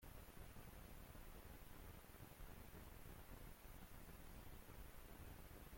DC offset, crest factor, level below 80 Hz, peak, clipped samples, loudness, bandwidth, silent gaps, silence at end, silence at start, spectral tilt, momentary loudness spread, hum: under 0.1%; 12 dB; -62 dBFS; -46 dBFS; under 0.1%; -61 LUFS; 16.5 kHz; none; 0 s; 0 s; -4.5 dB/octave; 1 LU; none